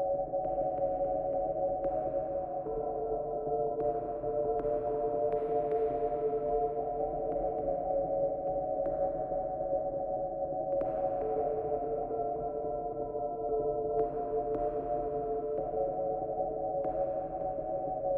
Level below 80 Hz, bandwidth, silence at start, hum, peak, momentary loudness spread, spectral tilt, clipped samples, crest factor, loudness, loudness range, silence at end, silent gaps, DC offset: -52 dBFS; 3 kHz; 0 s; none; -18 dBFS; 4 LU; -11.5 dB/octave; under 0.1%; 14 dB; -33 LUFS; 2 LU; 0 s; none; under 0.1%